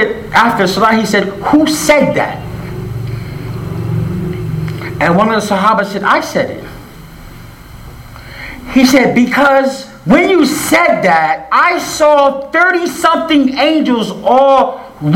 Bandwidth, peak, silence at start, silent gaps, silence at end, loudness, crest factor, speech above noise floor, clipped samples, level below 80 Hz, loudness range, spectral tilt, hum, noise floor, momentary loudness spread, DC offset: 17.5 kHz; 0 dBFS; 0 s; none; 0 s; -11 LUFS; 12 dB; 22 dB; under 0.1%; -38 dBFS; 6 LU; -5 dB/octave; none; -32 dBFS; 14 LU; under 0.1%